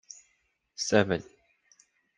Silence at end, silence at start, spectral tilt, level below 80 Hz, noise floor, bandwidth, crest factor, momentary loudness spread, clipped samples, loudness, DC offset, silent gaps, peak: 0.95 s; 0.8 s; -4 dB/octave; -68 dBFS; -74 dBFS; 10.5 kHz; 26 dB; 24 LU; under 0.1%; -28 LUFS; under 0.1%; none; -6 dBFS